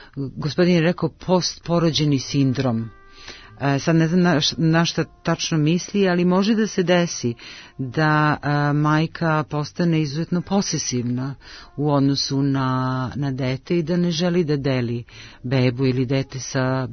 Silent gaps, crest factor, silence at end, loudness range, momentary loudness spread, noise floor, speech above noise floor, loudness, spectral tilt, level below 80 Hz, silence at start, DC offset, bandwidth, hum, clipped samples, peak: none; 16 dB; 0 s; 3 LU; 10 LU; -41 dBFS; 21 dB; -21 LUFS; -5.5 dB/octave; -50 dBFS; 0 s; under 0.1%; 6.6 kHz; none; under 0.1%; -4 dBFS